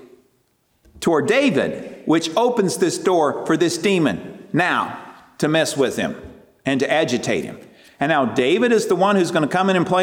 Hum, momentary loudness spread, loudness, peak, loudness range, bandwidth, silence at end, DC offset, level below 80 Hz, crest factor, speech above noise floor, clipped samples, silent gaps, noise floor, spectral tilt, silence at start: none; 9 LU; -19 LUFS; -4 dBFS; 3 LU; 17.5 kHz; 0 s; under 0.1%; -58 dBFS; 14 dB; 46 dB; under 0.1%; none; -64 dBFS; -4.5 dB/octave; 0.95 s